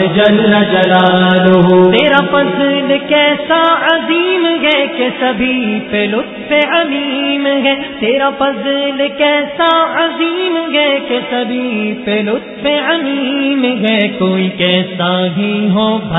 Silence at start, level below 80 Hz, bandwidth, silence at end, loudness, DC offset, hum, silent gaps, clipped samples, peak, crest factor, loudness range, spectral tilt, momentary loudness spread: 0 s; -48 dBFS; 4 kHz; 0 s; -12 LUFS; under 0.1%; none; none; under 0.1%; 0 dBFS; 12 dB; 5 LU; -8 dB/octave; 7 LU